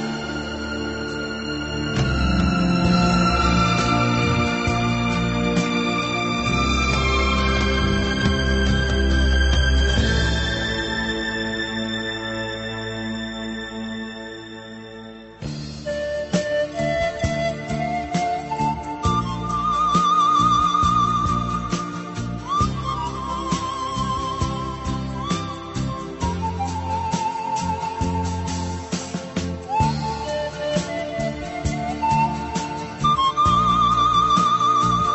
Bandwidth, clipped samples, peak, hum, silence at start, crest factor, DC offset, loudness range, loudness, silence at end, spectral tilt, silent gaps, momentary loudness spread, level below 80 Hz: 8.2 kHz; under 0.1%; -6 dBFS; none; 0 s; 16 dB; under 0.1%; 7 LU; -22 LUFS; 0 s; -5 dB/octave; none; 11 LU; -30 dBFS